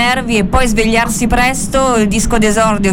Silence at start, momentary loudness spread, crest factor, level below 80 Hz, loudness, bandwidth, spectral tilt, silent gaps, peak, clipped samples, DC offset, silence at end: 0 s; 2 LU; 12 dB; -22 dBFS; -12 LUFS; 17.5 kHz; -4 dB/octave; none; 0 dBFS; under 0.1%; under 0.1%; 0 s